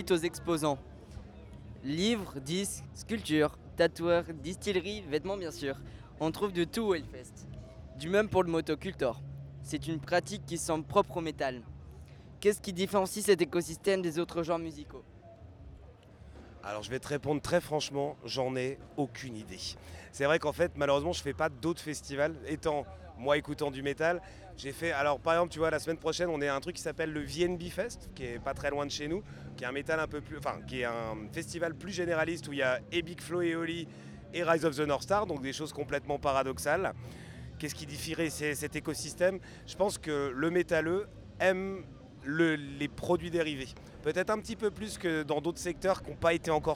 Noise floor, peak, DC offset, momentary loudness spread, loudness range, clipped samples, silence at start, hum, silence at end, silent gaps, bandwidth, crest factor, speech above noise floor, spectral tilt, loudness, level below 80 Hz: -53 dBFS; -12 dBFS; under 0.1%; 16 LU; 4 LU; under 0.1%; 0 s; none; 0 s; none; 17.5 kHz; 22 dB; 21 dB; -4.5 dB/octave; -33 LUFS; -54 dBFS